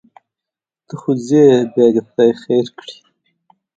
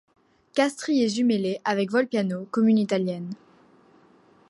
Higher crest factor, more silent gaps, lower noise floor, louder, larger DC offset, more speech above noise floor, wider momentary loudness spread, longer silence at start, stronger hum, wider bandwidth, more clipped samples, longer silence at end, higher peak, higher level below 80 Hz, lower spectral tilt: about the same, 16 dB vs 16 dB; neither; first, -86 dBFS vs -57 dBFS; first, -14 LUFS vs -24 LUFS; neither; first, 72 dB vs 34 dB; first, 21 LU vs 9 LU; first, 0.95 s vs 0.55 s; neither; second, 7.8 kHz vs 11.5 kHz; neither; second, 0.85 s vs 1.15 s; first, 0 dBFS vs -8 dBFS; first, -64 dBFS vs -74 dBFS; first, -7 dB/octave vs -5.5 dB/octave